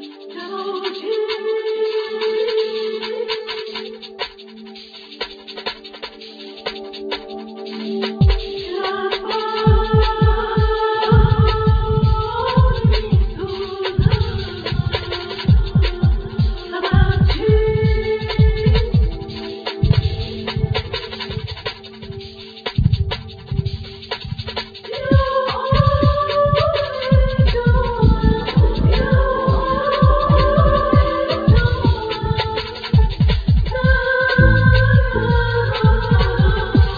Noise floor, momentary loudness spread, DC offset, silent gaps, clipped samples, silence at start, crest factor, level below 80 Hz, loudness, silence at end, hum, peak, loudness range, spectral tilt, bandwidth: -37 dBFS; 14 LU; under 0.1%; none; under 0.1%; 0 s; 16 dB; -22 dBFS; -18 LUFS; 0 s; none; 0 dBFS; 9 LU; -8.5 dB/octave; 5 kHz